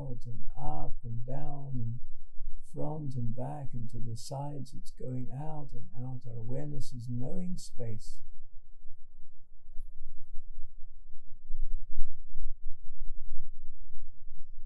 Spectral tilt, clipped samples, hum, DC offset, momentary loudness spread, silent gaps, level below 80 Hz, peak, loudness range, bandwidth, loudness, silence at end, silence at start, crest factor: -7.5 dB/octave; under 0.1%; none; under 0.1%; 18 LU; none; -40 dBFS; -8 dBFS; 10 LU; 8.4 kHz; -42 LUFS; 0 s; 0 s; 16 dB